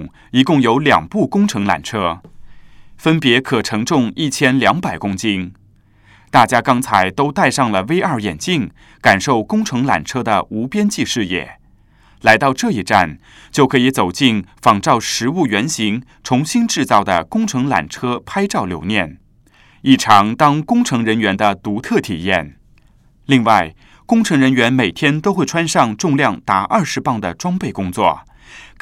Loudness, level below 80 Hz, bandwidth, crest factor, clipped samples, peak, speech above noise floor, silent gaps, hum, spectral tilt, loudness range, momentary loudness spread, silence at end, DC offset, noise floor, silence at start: -15 LUFS; -48 dBFS; 16 kHz; 16 dB; under 0.1%; 0 dBFS; 35 dB; none; none; -4.5 dB/octave; 2 LU; 8 LU; 0.15 s; under 0.1%; -50 dBFS; 0 s